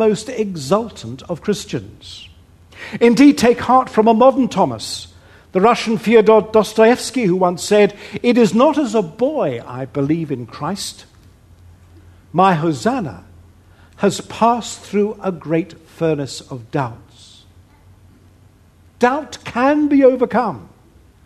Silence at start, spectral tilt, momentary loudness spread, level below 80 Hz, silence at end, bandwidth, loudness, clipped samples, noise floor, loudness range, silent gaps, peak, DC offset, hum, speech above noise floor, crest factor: 0 s; -5.5 dB/octave; 15 LU; -52 dBFS; 0.6 s; 13.5 kHz; -16 LUFS; under 0.1%; -49 dBFS; 9 LU; none; 0 dBFS; under 0.1%; none; 33 dB; 16 dB